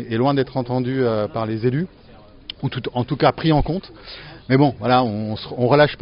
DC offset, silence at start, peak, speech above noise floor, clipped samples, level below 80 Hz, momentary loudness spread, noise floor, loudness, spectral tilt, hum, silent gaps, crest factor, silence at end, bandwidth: under 0.1%; 0 s; -2 dBFS; 20 dB; under 0.1%; -40 dBFS; 18 LU; -39 dBFS; -20 LUFS; -5.5 dB/octave; none; none; 18 dB; 0 s; 5.6 kHz